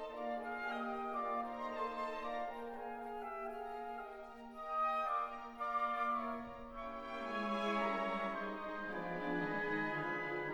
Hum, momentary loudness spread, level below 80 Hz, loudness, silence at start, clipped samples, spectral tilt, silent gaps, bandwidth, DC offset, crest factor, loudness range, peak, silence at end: none; 10 LU; -66 dBFS; -41 LUFS; 0 s; under 0.1%; -6 dB/octave; none; 19 kHz; under 0.1%; 16 dB; 4 LU; -26 dBFS; 0 s